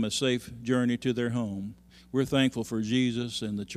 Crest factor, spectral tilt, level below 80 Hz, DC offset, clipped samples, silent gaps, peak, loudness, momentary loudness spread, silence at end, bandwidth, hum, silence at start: 18 dB; -5 dB/octave; -58 dBFS; under 0.1%; under 0.1%; none; -12 dBFS; -29 LUFS; 7 LU; 0 s; 14.5 kHz; none; 0 s